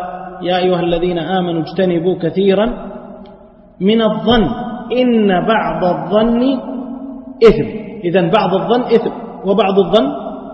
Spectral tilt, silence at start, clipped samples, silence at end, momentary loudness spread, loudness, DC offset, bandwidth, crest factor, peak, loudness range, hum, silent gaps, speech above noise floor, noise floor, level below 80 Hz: -8 dB/octave; 0 s; under 0.1%; 0 s; 13 LU; -14 LUFS; under 0.1%; 6.6 kHz; 14 dB; 0 dBFS; 2 LU; none; none; 27 dB; -41 dBFS; -36 dBFS